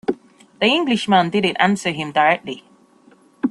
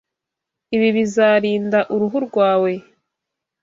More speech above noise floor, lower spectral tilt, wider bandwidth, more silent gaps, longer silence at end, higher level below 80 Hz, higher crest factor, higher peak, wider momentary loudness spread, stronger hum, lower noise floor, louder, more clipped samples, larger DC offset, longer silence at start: second, 34 dB vs 66 dB; about the same, -5 dB/octave vs -6 dB/octave; first, 12 kHz vs 7.8 kHz; neither; second, 0 s vs 0.8 s; about the same, -62 dBFS vs -64 dBFS; about the same, 18 dB vs 16 dB; about the same, -2 dBFS vs -2 dBFS; first, 13 LU vs 7 LU; neither; second, -52 dBFS vs -83 dBFS; about the same, -18 LUFS vs -17 LUFS; neither; neither; second, 0.1 s vs 0.7 s